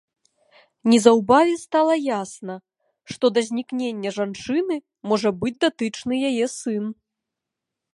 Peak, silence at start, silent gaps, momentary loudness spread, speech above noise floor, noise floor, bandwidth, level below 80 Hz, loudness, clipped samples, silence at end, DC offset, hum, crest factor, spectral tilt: 0 dBFS; 0.85 s; none; 13 LU; 63 dB; -84 dBFS; 11.5 kHz; -64 dBFS; -21 LUFS; under 0.1%; 1 s; under 0.1%; none; 22 dB; -4.5 dB/octave